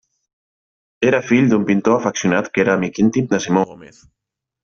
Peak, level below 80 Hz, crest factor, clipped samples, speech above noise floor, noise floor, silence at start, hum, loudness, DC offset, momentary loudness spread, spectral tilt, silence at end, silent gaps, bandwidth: -2 dBFS; -56 dBFS; 16 dB; under 0.1%; over 73 dB; under -90 dBFS; 1 s; none; -17 LUFS; under 0.1%; 4 LU; -6 dB/octave; 0.8 s; none; 7.4 kHz